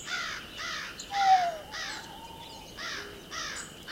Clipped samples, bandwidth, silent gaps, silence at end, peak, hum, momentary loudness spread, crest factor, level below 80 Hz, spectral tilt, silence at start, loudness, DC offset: under 0.1%; 16.5 kHz; none; 0 s; -12 dBFS; none; 19 LU; 20 dB; -58 dBFS; -1.5 dB/octave; 0 s; -32 LUFS; under 0.1%